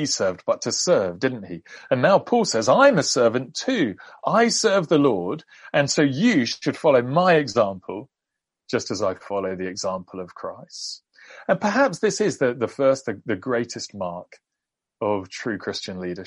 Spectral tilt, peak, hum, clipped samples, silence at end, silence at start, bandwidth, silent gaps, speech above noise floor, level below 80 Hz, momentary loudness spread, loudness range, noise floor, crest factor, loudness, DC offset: -4 dB/octave; -4 dBFS; none; under 0.1%; 0 s; 0 s; 11.5 kHz; none; 63 dB; -66 dBFS; 15 LU; 9 LU; -85 dBFS; 18 dB; -22 LUFS; under 0.1%